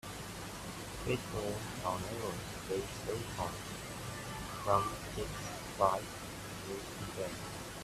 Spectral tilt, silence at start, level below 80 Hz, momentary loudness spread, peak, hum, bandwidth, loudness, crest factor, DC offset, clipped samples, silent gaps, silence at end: -4.5 dB/octave; 0.05 s; -54 dBFS; 11 LU; -14 dBFS; none; 15.5 kHz; -39 LUFS; 24 dB; under 0.1%; under 0.1%; none; 0 s